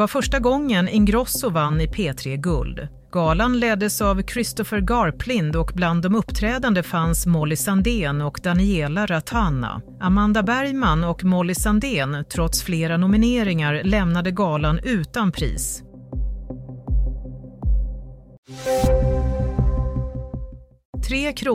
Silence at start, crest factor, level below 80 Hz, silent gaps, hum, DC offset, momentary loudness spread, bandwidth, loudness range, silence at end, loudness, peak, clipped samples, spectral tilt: 0 s; 16 dB; -28 dBFS; 18.38-18.43 s, 20.85-20.93 s; none; under 0.1%; 12 LU; 16 kHz; 5 LU; 0 s; -21 LUFS; -6 dBFS; under 0.1%; -5.5 dB/octave